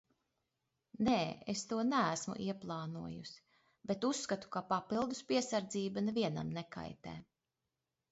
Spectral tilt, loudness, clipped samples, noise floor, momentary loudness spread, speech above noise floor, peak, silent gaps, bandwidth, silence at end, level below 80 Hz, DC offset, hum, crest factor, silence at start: -4.5 dB/octave; -38 LUFS; under 0.1%; -89 dBFS; 14 LU; 52 dB; -20 dBFS; none; 8 kHz; 0.9 s; -70 dBFS; under 0.1%; none; 20 dB; 1 s